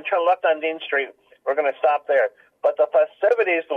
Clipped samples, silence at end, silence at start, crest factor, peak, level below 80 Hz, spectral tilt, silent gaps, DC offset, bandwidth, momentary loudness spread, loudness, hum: under 0.1%; 0 s; 0.05 s; 12 dB; -8 dBFS; -82 dBFS; -4 dB/octave; none; under 0.1%; 4.8 kHz; 6 LU; -21 LUFS; none